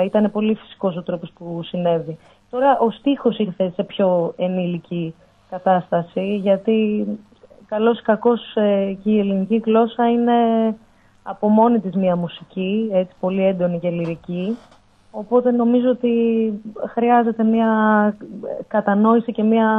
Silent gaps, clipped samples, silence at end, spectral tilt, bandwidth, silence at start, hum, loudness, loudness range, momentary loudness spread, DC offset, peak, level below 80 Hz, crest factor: none; under 0.1%; 0 s; -9.5 dB/octave; 3.9 kHz; 0 s; none; -19 LUFS; 4 LU; 12 LU; under 0.1%; -2 dBFS; -60 dBFS; 16 dB